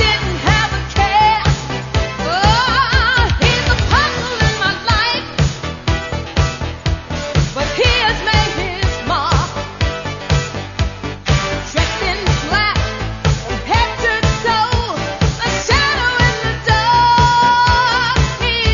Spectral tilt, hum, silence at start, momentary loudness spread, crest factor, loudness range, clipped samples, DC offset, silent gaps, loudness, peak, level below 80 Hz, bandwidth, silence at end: -4 dB/octave; none; 0 s; 9 LU; 16 dB; 5 LU; under 0.1%; under 0.1%; none; -15 LUFS; 0 dBFS; -24 dBFS; 7.4 kHz; 0 s